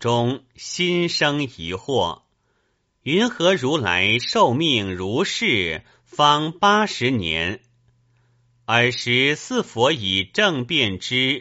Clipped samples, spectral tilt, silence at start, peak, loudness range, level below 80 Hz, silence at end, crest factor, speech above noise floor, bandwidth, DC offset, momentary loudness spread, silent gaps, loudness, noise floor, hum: under 0.1%; -2.5 dB/octave; 0 s; -2 dBFS; 3 LU; -54 dBFS; 0 s; 20 dB; 48 dB; 8 kHz; under 0.1%; 10 LU; none; -20 LUFS; -68 dBFS; none